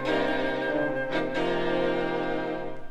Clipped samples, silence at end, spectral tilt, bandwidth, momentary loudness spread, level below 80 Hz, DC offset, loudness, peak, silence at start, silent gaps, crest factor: under 0.1%; 0 s; -6 dB/octave; 9.6 kHz; 4 LU; -46 dBFS; under 0.1%; -28 LUFS; -14 dBFS; 0 s; none; 14 dB